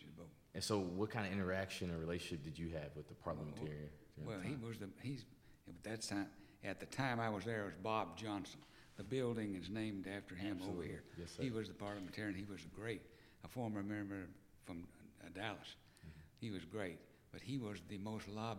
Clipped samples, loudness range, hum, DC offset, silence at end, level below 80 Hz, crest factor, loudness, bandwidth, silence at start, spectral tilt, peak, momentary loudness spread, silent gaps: under 0.1%; 6 LU; none; under 0.1%; 0 s; -68 dBFS; 22 dB; -46 LUFS; 16.5 kHz; 0 s; -5.5 dB/octave; -24 dBFS; 16 LU; none